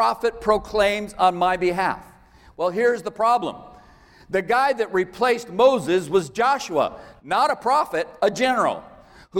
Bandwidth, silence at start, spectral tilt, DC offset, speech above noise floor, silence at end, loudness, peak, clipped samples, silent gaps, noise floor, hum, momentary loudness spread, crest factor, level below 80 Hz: 16.5 kHz; 0 s; -4.5 dB/octave; under 0.1%; 29 dB; 0 s; -21 LUFS; -4 dBFS; under 0.1%; none; -50 dBFS; none; 8 LU; 18 dB; -52 dBFS